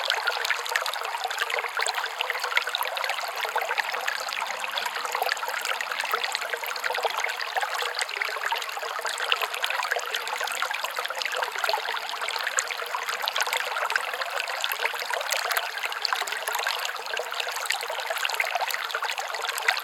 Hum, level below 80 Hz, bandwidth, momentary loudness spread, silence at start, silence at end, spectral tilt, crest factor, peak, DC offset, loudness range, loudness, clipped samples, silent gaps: none; -86 dBFS; 19 kHz; 4 LU; 0 s; 0 s; 3 dB/octave; 26 dB; -2 dBFS; under 0.1%; 1 LU; -27 LUFS; under 0.1%; none